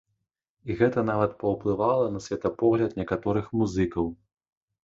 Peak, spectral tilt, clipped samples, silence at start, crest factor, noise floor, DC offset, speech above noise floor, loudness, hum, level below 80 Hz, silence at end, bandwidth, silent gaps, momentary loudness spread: -8 dBFS; -7.5 dB/octave; under 0.1%; 0.65 s; 18 dB; -80 dBFS; under 0.1%; 55 dB; -26 LUFS; none; -50 dBFS; 0.7 s; 7.8 kHz; none; 7 LU